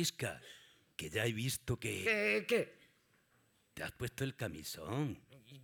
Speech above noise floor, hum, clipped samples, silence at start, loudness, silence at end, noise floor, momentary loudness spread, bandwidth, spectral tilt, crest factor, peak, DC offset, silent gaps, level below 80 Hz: 35 dB; none; under 0.1%; 0 s; -38 LUFS; 0 s; -74 dBFS; 19 LU; over 20 kHz; -4 dB/octave; 20 dB; -20 dBFS; under 0.1%; none; -68 dBFS